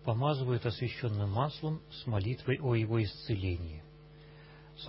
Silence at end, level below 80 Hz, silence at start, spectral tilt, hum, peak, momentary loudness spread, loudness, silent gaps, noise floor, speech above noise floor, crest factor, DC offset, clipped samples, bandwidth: 0 s; -50 dBFS; 0 s; -10.5 dB/octave; none; -16 dBFS; 21 LU; -34 LUFS; none; -54 dBFS; 21 dB; 18 dB; under 0.1%; under 0.1%; 5.8 kHz